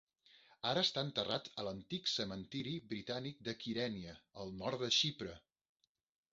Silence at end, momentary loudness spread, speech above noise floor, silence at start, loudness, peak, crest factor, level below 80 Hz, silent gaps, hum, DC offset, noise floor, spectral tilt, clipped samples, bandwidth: 0.95 s; 15 LU; 27 dB; 0.35 s; -39 LUFS; -20 dBFS; 22 dB; -70 dBFS; none; none; under 0.1%; -68 dBFS; -2.5 dB/octave; under 0.1%; 7.6 kHz